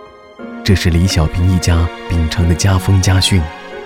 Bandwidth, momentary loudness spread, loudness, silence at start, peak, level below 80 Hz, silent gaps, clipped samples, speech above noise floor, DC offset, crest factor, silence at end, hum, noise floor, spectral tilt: 15.5 kHz; 8 LU; -14 LUFS; 0 s; 0 dBFS; -24 dBFS; none; under 0.1%; 21 dB; under 0.1%; 12 dB; 0 s; none; -33 dBFS; -5 dB/octave